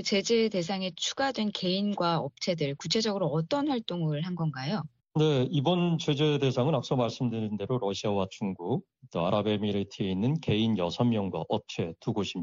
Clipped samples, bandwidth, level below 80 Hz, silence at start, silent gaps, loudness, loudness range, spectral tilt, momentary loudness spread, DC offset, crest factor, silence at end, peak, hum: under 0.1%; 7.6 kHz; -66 dBFS; 0 s; none; -29 LUFS; 2 LU; -5 dB/octave; 7 LU; under 0.1%; 16 dB; 0 s; -12 dBFS; none